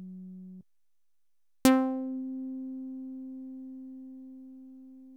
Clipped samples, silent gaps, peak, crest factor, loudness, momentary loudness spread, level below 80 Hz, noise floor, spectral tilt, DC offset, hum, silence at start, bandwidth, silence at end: under 0.1%; none; -8 dBFS; 26 dB; -31 LUFS; 25 LU; -68 dBFS; -89 dBFS; -4.5 dB/octave; under 0.1%; none; 0 s; 17.5 kHz; 0 s